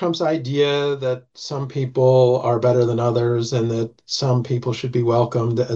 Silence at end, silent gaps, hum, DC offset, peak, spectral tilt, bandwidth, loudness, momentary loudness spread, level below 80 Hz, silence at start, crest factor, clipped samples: 0 s; none; none; under 0.1%; -4 dBFS; -6.5 dB/octave; 7.6 kHz; -20 LUFS; 9 LU; -60 dBFS; 0 s; 14 dB; under 0.1%